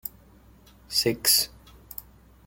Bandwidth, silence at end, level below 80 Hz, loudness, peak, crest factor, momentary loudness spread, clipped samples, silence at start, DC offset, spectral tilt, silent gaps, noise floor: 17 kHz; 0.45 s; -54 dBFS; -23 LUFS; -6 dBFS; 24 dB; 21 LU; under 0.1%; 0.05 s; under 0.1%; -1.5 dB/octave; none; -54 dBFS